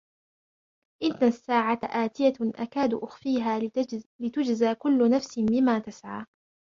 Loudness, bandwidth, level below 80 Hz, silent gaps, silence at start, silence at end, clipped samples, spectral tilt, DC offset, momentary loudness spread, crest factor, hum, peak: -26 LUFS; 7.4 kHz; -66 dBFS; 4.06-4.19 s; 1 s; 0.5 s; under 0.1%; -6 dB/octave; under 0.1%; 10 LU; 16 dB; none; -10 dBFS